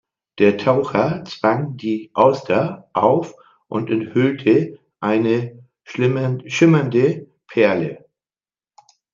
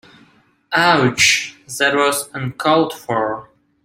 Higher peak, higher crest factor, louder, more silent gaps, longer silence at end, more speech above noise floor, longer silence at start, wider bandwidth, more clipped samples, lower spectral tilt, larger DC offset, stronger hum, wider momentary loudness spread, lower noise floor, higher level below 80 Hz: about the same, -2 dBFS vs 0 dBFS; about the same, 18 dB vs 18 dB; about the same, -18 LUFS vs -16 LUFS; neither; first, 1.15 s vs 0.4 s; first, over 72 dB vs 37 dB; second, 0.35 s vs 0.7 s; second, 7.4 kHz vs 16.5 kHz; neither; first, -7 dB/octave vs -3 dB/octave; neither; neither; about the same, 11 LU vs 12 LU; first, under -90 dBFS vs -53 dBFS; second, -64 dBFS vs -56 dBFS